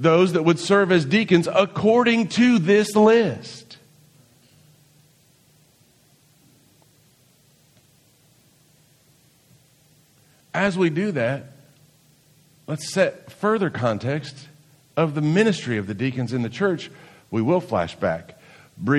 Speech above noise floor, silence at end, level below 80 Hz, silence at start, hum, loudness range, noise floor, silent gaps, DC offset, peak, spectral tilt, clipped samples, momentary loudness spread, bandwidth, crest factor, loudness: 38 dB; 0 s; -62 dBFS; 0 s; none; 9 LU; -58 dBFS; none; under 0.1%; -2 dBFS; -6 dB/octave; under 0.1%; 13 LU; 13.5 kHz; 20 dB; -21 LUFS